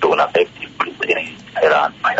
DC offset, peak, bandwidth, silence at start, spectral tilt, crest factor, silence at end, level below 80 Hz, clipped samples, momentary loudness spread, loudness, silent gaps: under 0.1%; -4 dBFS; 8 kHz; 0 s; -4 dB/octave; 12 dB; 0 s; -58 dBFS; under 0.1%; 9 LU; -18 LUFS; none